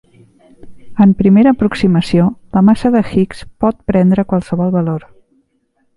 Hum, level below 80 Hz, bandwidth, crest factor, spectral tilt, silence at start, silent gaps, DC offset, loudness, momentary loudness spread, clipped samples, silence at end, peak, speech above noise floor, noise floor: none; -40 dBFS; 11.5 kHz; 14 dB; -8.5 dB/octave; 0.65 s; none; under 0.1%; -13 LUFS; 8 LU; under 0.1%; 1 s; 0 dBFS; 50 dB; -61 dBFS